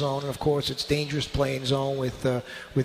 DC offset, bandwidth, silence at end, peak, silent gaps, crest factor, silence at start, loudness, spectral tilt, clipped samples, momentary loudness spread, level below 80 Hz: under 0.1%; 15.5 kHz; 0 s; -10 dBFS; none; 16 dB; 0 s; -27 LUFS; -5.5 dB/octave; under 0.1%; 3 LU; -46 dBFS